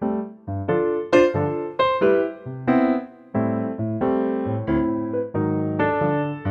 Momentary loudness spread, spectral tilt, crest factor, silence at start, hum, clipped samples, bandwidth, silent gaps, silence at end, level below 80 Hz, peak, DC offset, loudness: 9 LU; -8 dB/octave; 18 dB; 0 s; none; under 0.1%; 7.8 kHz; none; 0 s; -50 dBFS; -4 dBFS; under 0.1%; -22 LUFS